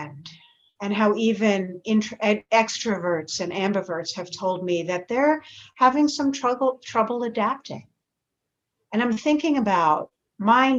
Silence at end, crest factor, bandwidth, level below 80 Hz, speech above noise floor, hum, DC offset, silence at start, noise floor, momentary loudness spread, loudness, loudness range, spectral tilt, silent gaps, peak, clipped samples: 0 s; 20 dB; 8 kHz; -66 dBFS; 60 dB; none; under 0.1%; 0 s; -82 dBFS; 9 LU; -23 LUFS; 3 LU; -4.5 dB/octave; none; -4 dBFS; under 0.1%